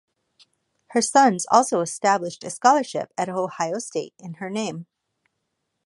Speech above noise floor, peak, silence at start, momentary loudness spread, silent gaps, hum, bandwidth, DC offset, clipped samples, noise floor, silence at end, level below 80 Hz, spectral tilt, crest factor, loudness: 55 dB; -2 dBFS; 0.9 s; 14 LU; none; none; 11.5 kHz; under 0.1%; under 0.1%; -77 dBFS; 1.05 s; -76 dBFS; -3.5 dB/octave; 22 dB; -22 LUFS